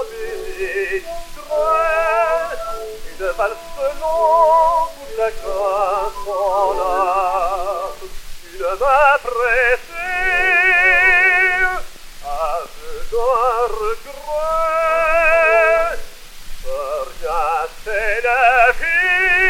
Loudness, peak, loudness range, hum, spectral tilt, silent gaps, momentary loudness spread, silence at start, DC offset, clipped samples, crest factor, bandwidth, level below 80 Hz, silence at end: -16 LUFS; 0 dBFS; 6 LU; none; -2.5 dB/octave; none; 15 LU; 0 s; under 0.1%; under 0.1%; 16 dB; 17 kHz; -34 dBFS; 0 s